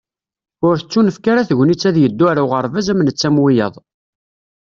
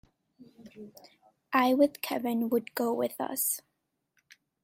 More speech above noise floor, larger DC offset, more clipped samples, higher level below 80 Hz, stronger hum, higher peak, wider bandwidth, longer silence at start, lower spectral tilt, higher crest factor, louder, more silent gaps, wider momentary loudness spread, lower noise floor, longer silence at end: first, 76 dB vs 49 dB; neither; neither; first, -54 dBFS vs -76 dBFS; neither; first, -2 dBFS vs -8 dBFS; second, 7.4 kHz vs 16.5 kHz; about the same, 0.6 s vs 0.6 s; first, -6.5 dB/octave vs -3 dB/octave; second, 12 dB vs 24 dB; first, -15 LUFS vs -29 LUFS; neither; second, 4 LU vs 24 LU; first, -89 dBFS vs -78 dBFS; about the same, 0.95 s vs 1.05 s